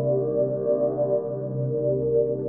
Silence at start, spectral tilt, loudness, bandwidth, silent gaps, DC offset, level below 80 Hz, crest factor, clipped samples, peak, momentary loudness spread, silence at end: 0 s; -11.5 dB/octave; -25 LUFS; 1.9 kHz; none; 0.1%; -56 dBFS; 12 dB; under 0.1%; -12 dBFS; 4 LU; 0 s